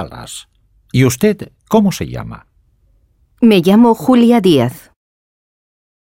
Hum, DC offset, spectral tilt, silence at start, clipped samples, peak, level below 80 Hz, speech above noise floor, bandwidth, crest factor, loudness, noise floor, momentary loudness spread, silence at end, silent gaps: none; under 0.1%; -6 dB/octave; 0 s; under 0.1%; 0 dBFS; -44 dBFS; 43 dB; 16.5 kHz; 14 dB; -12 LUFS; -55 dBFS; 19 LU; 1.25 s; none